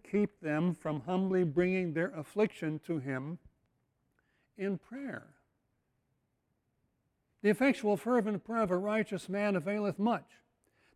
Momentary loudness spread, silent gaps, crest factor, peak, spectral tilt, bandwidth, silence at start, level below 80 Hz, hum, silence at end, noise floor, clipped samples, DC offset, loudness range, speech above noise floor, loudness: 10 LU; none; 18 dB; -16 dBFS; -7.5 dB/octave; 13.5 kHz; 0.05 s; -70 dBFS; none; 0.75 s; -80 dBFS; under 0.1%; under 0.1%; 13 LU; 47 dB; -33 LUFS